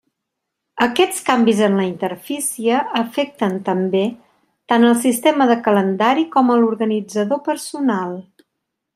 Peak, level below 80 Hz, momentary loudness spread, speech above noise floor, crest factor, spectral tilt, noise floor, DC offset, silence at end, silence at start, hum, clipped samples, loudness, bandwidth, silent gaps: -2 dBFS; -66 dBFS; 9 LU; 62 dB; 16 dB; -4.5 dB/octave; -79 dBFS; under 0.1%; 0.75 s; 0.75 s; none; under 0.1%; -17 LUFS; 15.5 kHz; none